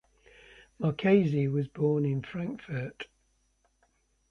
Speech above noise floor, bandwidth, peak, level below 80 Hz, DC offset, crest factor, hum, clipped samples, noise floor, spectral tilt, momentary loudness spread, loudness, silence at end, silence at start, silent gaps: 43 dB; 6.6 kHz; -12 dBFS; -64 dBFS; under 0.1%; 20 dB; none; under 0.1%; -72 dBFS; -9 dB/octave; 14 LU; -29 LUFS; 1.25 s; 0.8 s; none